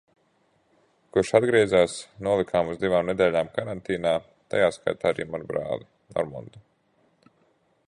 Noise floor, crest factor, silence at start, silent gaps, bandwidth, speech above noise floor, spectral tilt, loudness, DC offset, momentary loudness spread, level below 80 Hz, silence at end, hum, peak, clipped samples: -67 dBFS; 22 dB; 1.15 s; none; 11.5 kHz; 42 dB; -5.5 dB/octave; -25 LUFS; under 0.1%; 11 LU; -56 dBFS; 1.3 s; none; -4 dBFS; under 0.1%